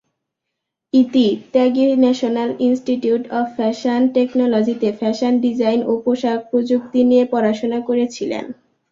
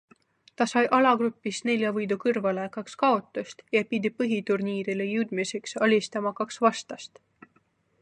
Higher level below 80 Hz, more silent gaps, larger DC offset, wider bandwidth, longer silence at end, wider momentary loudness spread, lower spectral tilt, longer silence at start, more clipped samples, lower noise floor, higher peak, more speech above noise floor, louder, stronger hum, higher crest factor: first, -62 dBFS vs -78 dBFS; neither; neither; second, 7.4 kHz vs 10.5 kHz; second, 0.4 s vs 0.95 s; second, 6 LU vs 11 LU; about the same, -6 dB/octave vs -5 dB/octave; first, 0.95 s vs 0.6 s; neither; first, -79 dBFS vs -68 dBFS; first, -2 dBFS vs -6 dBFS; first, 63 dB vs 41 dB; first, -17 LUFS vs -26 LUFS; neither; second, 14 dB vs 20 dB